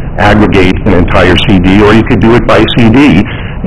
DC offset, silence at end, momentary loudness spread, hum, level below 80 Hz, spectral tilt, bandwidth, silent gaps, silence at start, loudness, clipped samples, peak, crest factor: under 0.1%; 0 s; 3 LU; none; -18 dBFS; -7 dB/octave; 12 kHz; none; 0 s; -5 LUFS; 10%; 0 dBFS; 6 dB